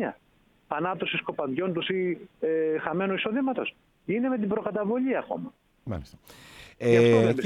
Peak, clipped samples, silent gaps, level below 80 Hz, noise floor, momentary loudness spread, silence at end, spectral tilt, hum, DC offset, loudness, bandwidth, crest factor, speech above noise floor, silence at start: -8 dBFS; under 0.1%; none; -58 dBFS; -64 dBFS; 16 LU; 0 s; -7 dB/octave; none; under 0.1%; -27 LUFS; 12 kHz; 20 dB; 37 dB; 0 s